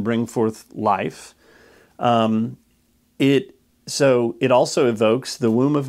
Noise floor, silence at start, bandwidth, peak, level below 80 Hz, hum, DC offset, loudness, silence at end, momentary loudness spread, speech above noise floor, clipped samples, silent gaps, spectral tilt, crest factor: -61 dBFS; 0 s; 15 kHz; -4 dBFS; -66 dBFS; none; under 0.1%; -20 LUFS; 0 s; 9 LU; 42 dB; under 0.1%; none; -5.5 dB/octave; 16 dB